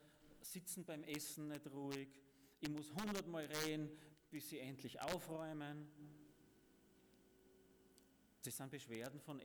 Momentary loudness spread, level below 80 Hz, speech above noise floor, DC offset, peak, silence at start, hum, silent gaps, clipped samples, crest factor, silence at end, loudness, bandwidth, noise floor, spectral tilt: 15 LU; -78 dBFS; 23 dB; under 0.1%; -28 dBFS; 0 s; none; none; under 0.1%; 22 dB; 0 s; -49 LUFS; over 20 kHz; -72 dBFS; -4 dB/octave